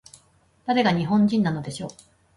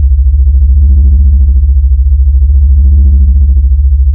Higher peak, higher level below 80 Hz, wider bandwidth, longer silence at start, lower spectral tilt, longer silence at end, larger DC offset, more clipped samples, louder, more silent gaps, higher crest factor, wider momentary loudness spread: second, -8 dBFS vs 0 dBFS; second, -58 dBFS vs -4 dBFS; first, 11.5 kHz vs 0.6 kHz; first, 0.65 s vs 0 s; second, -6.5 dB/octave vs -15 dB/octave; first, 0.45 s vs 0 s; neither; neither; second, -22 LUFS vs -8 LUFS; neither; first, 16 dB vs 4 dB; first, 15 LU vs 2 LU